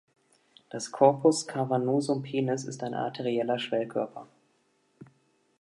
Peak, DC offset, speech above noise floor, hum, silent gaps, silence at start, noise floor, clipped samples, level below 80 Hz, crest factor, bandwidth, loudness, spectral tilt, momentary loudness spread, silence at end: -6 dBFS; under 0.1%; 43 dB; none; none; 0.75 s; -70 dBFS; under 0.1%; -80 dBFS; 22 dB; 11.5 kHz; -28 LUFS; -5.5 dB/octave; 14 LU; 0.55 s